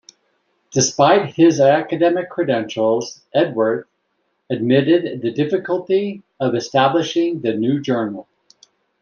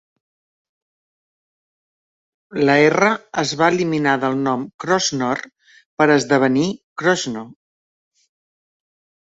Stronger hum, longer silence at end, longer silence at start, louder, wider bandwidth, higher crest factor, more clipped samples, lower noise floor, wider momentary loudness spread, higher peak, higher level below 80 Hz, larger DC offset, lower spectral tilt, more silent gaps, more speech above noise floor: neither; second, 0.8 s vs 1.75 s; second, 0.75 s vs 2.5 s; about the same, -18 LUFS vs -18 LUFS; about the same, 7.4 kHz vs 8 kHz; about the same, 16 dB vs 20 dB; neither; second, -69 dBFS vs under -90 dBFS; about the same, 9 LU vs 11 LU; about the same, -2 dBFS vs -2 dBFS; about the same, -62 dBFS vs -62 dBFS; neither; about the same, -5 dB/octave vs -4.5 dB/octave; second, none vs 4.74-4.79 s, 5.86-5.97 s, 6.83-6.96 s; second, 52 dB vs over 73 dB